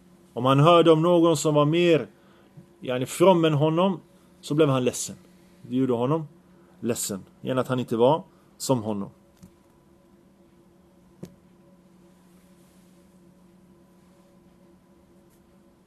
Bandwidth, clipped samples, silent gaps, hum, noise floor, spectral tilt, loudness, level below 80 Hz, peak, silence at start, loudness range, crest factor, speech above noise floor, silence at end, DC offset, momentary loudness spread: 13.5 kHz; under 0.1%; none; none; -57 dBFS; -6 dB/octave; -23 LUFS; -68 dBFS; -2 dBFS; 0.35 s; 9 LU; 24 dB; 36 dB; 4.6 s; under 0.1%; 16 LU